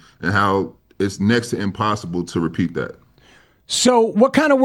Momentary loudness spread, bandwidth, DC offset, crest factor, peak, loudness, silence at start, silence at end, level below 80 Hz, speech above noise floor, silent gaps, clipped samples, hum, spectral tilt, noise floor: 10 LU; 16.5 kHz; under 0.1%; 16 dB; -2 dBFS; -19 LUFS; 0.2 s; 0 s; -52 dBFS; 34 dB; none; under 0.1%; none; -4.5 dB/octave; -52 dBFS